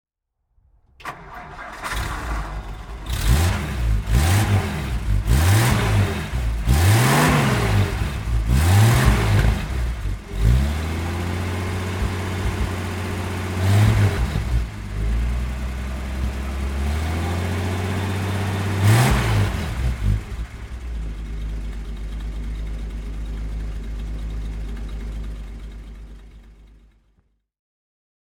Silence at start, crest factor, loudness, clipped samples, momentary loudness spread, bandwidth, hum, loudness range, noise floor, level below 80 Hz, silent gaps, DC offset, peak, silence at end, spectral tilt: 1 s; 20 dB; -22 LUFS; under 0.1%; 16 LU; 18.5 kHz; none; 14 LU; -73 dBFS; -26 dBFS; none; under 0.1%; -2 dBFS; 1.6 s; -5.5 dB/octave